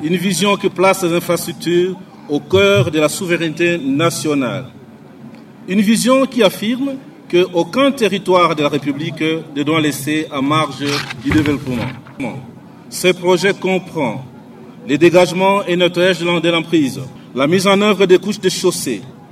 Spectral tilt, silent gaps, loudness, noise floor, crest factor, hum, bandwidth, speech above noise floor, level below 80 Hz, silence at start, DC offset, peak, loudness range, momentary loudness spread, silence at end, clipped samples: -5 dB/octave; none; -15 LUFS; -37 dBFS; 16 dB; none; 15.5 kHz; 22 dB; -52 dBFS; 0 s; under 0.1%; 0 dBFS; 4 LU; 11 LU; 0.05 s; under 0.1%